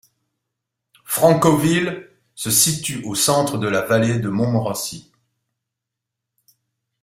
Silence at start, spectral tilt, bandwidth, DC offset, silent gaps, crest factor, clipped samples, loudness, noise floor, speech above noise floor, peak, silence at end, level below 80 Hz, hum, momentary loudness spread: 1.1 s; -4 dB/octave; 16 kHz; under 0.1%; none; 20 dB; under 0.1%; -18 LUFS; -83 dBFS; 64 dB; 0 dBFS; 2 s; -54 dBFS; none; 11 LU